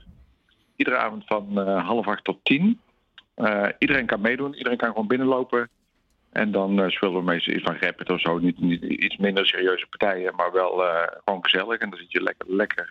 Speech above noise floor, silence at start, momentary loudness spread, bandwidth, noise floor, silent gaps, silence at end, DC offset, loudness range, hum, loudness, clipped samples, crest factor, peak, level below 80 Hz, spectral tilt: 44 dB; 0.8 s; 6 LU; 6.8 kHz; -67 dBFS; none; 0 s; under 0.1%; 2 LU; none; -23 LUFS; under 0.1%; 20 dB; -4 dBFS; -60 dBFS; -7.5 dB/octave